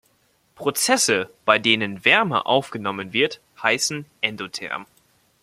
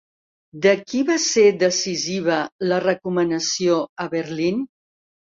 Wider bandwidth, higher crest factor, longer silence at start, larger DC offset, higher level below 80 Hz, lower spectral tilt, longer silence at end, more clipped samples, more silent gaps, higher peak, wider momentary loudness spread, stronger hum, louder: first, 16 kHz vs 7.8 kHz; about the same, 22 dB vs 18 dB; about the same, 0.6 s vs 0.55 s; neither; about the same, -66 dBFS vs -64 dBFS; second, -2 dB/octave vs -3.5 dB/octave; about the same, 0.6 s vs 0.65 s; neither; second, none vs 2.52-2.59 s, 3.89-3.96 s; first, 0 dBFS vs -4 dBFS; first, 12 LU vs 9 LU; neither; about the same, -21 LUFS vs -20 LUFS